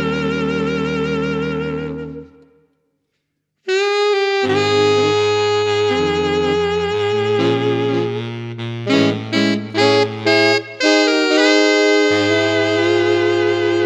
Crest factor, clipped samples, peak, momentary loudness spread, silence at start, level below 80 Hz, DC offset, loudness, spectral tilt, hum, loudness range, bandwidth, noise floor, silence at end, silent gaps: 16 dB; under 0.1%; 0 dBFS; 10 LU; 0 s; -48 dBFS; under 0.1%; -16 LUFS; -5 dB/octave; none; 8 LU; 9.4 kHz; -72 dBFS; 0 s; none